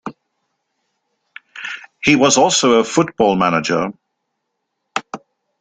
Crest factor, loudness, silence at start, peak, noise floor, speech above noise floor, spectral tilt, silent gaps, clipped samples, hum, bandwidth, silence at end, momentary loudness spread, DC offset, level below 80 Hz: 18 dB; -15 LUFS; 0.05 s; -2 dBFS; -74 dBFS; 60 dB; -3.5 dB/octave; none; under 0.1%; none; 9.6 kHz; 0.45 s; 21 LU; under 0.1%; -56 dBFS